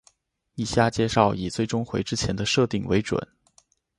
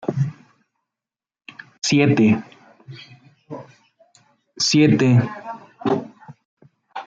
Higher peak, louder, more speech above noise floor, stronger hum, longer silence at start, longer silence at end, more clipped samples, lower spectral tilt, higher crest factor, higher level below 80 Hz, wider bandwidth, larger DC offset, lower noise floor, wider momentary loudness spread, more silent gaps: about the same, -4 dBFS vs -4 dBFS; second, -24 LUFS vs -18 LUFS; second, 39 dB vs over 75 dB; neither; first, 0.55 s vs 0.05 s; first, 0.75 s vs 0.05 s; neither; about the same, -5 dB/octave vs -5.5 dB/octave; about the same, 22 dB vs 18 dB; first, -48 dBFS vs -62 dBFS; first, 11.5 kHz vs 9.2 kHz; neither; second, -63 dBFS vs under -90 dBFS; second, 9 LU vs 26 LU; second, none vs 6.45-6.57 s